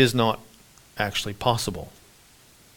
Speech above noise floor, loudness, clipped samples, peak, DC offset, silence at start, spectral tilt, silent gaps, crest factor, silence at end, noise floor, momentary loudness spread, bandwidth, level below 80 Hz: 30 dB; -26 LUFS; under 0.1%; -4 dBFS; under 0.1%; 0 s; -4.5 dB/octave; none; 22 dB; 0.9 s; -54 dBFS; 17 LU; 18.5 kHz; -50 dBFS